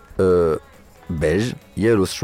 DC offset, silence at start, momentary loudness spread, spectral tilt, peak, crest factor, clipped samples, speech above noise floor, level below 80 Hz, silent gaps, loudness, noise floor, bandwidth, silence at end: under 0.1%; 0.15 s; 10 LU; -6 dB/octave; -6 dBFS; 14 dB; under 0.1%; 27 dB; -40 dBFS; none; -20 LUFS; -46 dBFS; 16.5 kHz; 0 s